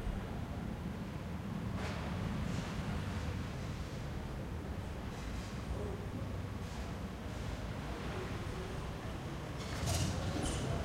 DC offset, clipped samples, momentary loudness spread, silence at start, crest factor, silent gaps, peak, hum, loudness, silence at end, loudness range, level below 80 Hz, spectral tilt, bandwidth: under 0.1%; under 0.1%; 6 LU; 0 s; 16 dB; none; -24 dBFS; none; -41 LUFS; 0 s; 3 LU; -46 dBFS; -5.5 dB/octave; 16 kHz